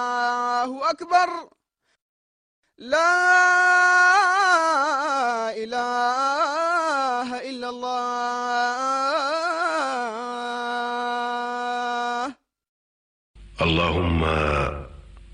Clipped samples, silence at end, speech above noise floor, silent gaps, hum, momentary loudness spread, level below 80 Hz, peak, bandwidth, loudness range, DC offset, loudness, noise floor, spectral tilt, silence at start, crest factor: under 0.1%; 0.05 s; 22 dB; 2.02-2.63 s, 12.69-13.34 s; none; 12 LU; -42 dBFS; -6 dBFS; 10 kHz; 8 LU; under 0.1%; -22 LUFS; -43 dBFS; -4 dB/octave; 0 s; 16 dB